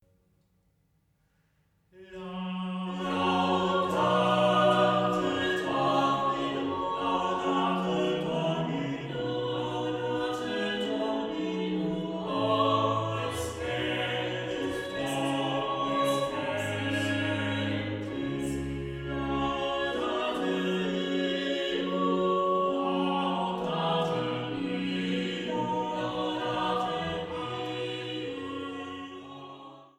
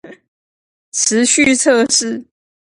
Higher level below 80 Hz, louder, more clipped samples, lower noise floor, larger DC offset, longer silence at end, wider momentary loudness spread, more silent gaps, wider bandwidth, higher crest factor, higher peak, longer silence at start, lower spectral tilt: about the same, -56 dBFS vs -56 dBFS; second, -29 LUFS vs -13 LUFS; neither; second, -70 dBFS vs under -90 dBFS; neither; second, 0.1 s vs 0.5 s; second, 8 LU vs 13 LU; second, none vs 0.28-0.92 s; first, 14.5 kHz vs 11.5 kHz; about the same, 18 dB vs 16 dB; second, -12 dBFS vs 0 dBFS; first, 1.95 s vs 0.05 s; first, -5.5 dB/octave vs -1.5 dB/octave